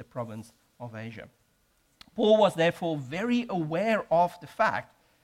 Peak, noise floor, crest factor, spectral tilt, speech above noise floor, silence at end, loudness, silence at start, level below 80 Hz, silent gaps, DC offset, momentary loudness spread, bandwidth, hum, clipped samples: -10 dBFS; -69 dBFS; 18 dB; -6 dB/octave; 41 dB; 0.4 s; -27 LUFS; 0 s; -66 dBFS; none; under 0.1%; 20 LU; 14.5 kHz; none; under 0.1%